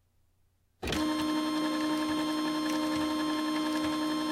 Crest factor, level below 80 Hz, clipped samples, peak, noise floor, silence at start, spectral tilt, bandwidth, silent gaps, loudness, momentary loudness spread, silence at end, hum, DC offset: 12 dB; -56 dBFS; under 0.1%; -18 dBFS; -70 dBFS; 0.8 s; -4 dB/octave; 16 kHz; none; -31 LUFS; 1 LU; 0 s; none; under 0.1%